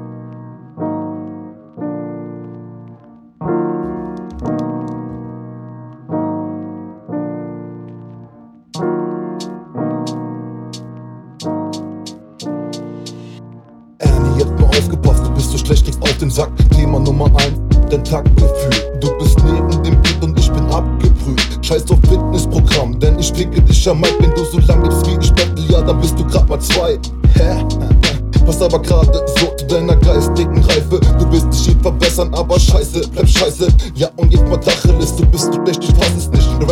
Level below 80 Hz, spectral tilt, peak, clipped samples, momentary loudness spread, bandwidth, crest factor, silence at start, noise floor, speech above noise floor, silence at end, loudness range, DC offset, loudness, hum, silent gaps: -16 dBFS; -5.5 dB/octave; 0 dBFS; under 0.1%; 18 LU; 14.5 kHz; 12 dB; 0 s; -41 dBFS; 30 dB; 0 s; 12 LU; under 0.1%; -14 LUFS; none; none